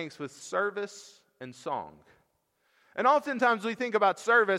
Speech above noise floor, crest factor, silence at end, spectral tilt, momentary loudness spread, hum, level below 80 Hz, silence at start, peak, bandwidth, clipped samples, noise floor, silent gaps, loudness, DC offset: 46 dB; 18 dB; 0 s; -4 dB/octave; 20 LU; none; -80 dBFS; 0 s; -10 dBFS; 14 kHz; under 0.1%; -74 dBFS; none; -28 LUFS; under 0.1%